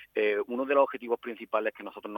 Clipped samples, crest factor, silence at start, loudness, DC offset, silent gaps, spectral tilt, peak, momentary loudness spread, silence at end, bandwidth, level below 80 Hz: under 0.1%; 20 dB; 0 s; -29 LUFS; under 0.1%; none; -6 dB/octave; -10 dBFS; 8 LU; 0 s; 17.5 kHz; -78 dBFS